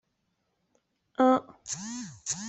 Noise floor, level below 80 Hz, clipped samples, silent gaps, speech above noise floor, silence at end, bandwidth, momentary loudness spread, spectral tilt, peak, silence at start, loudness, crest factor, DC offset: -77 dBFS; -72 dBFS; under 0.1%; none; 49 dB; 0 s; 8.4 kHz; 14 LU; -3.5 dB/octave; -12 dBFS; 1.2 s; -29 LUFS; 20 dB; under 0.1%